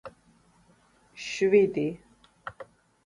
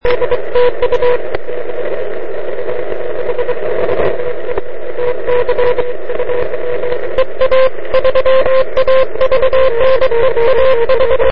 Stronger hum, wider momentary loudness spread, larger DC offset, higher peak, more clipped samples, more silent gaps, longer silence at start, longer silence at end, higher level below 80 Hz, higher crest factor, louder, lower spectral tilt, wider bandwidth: neither; first, 27 LU vs 10 LU; second, under 0.1% vs 30%; second, -10 dBFS vs 0 dBFS; neither; neither; about the same, 0.05 s vs 0 s; first, 0.4 s vs 0 s; second, -66 dBFS vs -34 dBFS; first, 20 dB vs 10 dB; second, -25 LUFS vs -14 LUFS; second, -5.5 dB/octave vs -7 dB/octave; first, 10.5 kHz vs 5.6 kHz